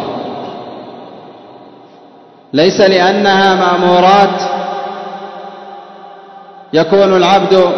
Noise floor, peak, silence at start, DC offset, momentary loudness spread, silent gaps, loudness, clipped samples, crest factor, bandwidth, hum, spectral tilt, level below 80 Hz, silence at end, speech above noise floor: -40 dBFS; 0 dBFS; 0 s; under 0.1%; 21 LU; none; -10 LUFS; 0.1%; 12 dB; 6.4 kHz; none; -5 dB/octave; -54 dBFS; 0 s; 32 dB